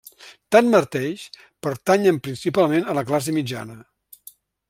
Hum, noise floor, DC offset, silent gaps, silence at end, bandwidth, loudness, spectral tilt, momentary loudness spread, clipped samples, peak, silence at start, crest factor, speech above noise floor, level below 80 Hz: none; -49 dBFS; under 0.1%; none; 0.9 s; 16.5 kHz; -20 LUFS; -5.5 dB/octave; 15 LU; under 0.1%; -2 dBFS; 0.2 s; 20 dB; 29 dB; -64 dBFS